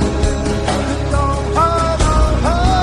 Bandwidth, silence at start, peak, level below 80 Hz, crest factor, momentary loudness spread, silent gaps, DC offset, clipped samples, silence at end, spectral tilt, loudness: 11 kHz; 0 s; -2 dBFS; -18 dBFS; 12 dB; 3 LU; none; under 0.1%; under 0.1%; 0 s; -5.5 dB/octave; -16 LUFS